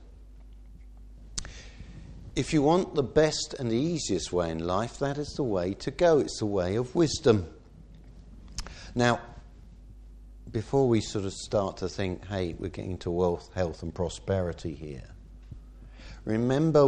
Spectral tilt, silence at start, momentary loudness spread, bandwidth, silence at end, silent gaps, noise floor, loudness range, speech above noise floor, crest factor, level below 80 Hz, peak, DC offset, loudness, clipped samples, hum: -5.5 dB/octave; 0 s; 21 LU; 11 kHz; 0 s; none; -50 dBFS; 5 LU; 23 dB; 22 dB; -46 dBFS; -8 dBFS; under 0.1%; -28 LUFS; under 0.1%; none